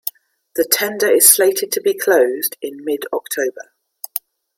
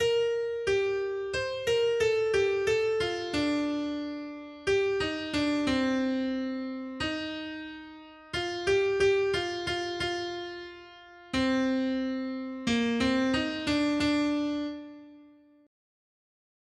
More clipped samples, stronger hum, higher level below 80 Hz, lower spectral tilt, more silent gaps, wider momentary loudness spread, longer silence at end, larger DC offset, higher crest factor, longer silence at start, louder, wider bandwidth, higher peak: neither; neither; second, -70 dBFS vs -56 dBFS; second, -0.5 dB/octave vs -4.5 dB/octave; neither; first, 18 LU vs 12 LU; second, 0.4 s vs 1.4 s; neither; about the same, 18 dB vs 14 dB; about the same, 0.05 s vs 0 s; first, -15 LUFS vs -29 LUFS; first, 17 kHz vs 12.5 kHz; first, 0 dBFS vs -14 dBFS